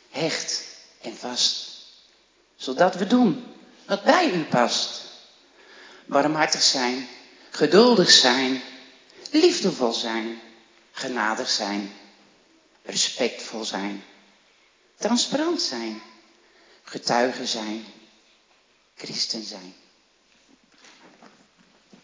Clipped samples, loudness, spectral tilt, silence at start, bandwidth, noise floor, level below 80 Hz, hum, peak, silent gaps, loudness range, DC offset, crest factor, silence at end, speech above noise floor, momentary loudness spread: under 0.1%; -22 LUFS; -2.5 dB/octave; 0.15 s; 7.8 kHz; -62 dBFS; -82 dBFS; none; -2 dBFS; none; 11 LU; under 0.1%; 24 dB; 2.3 s; 39 dB; 21 LU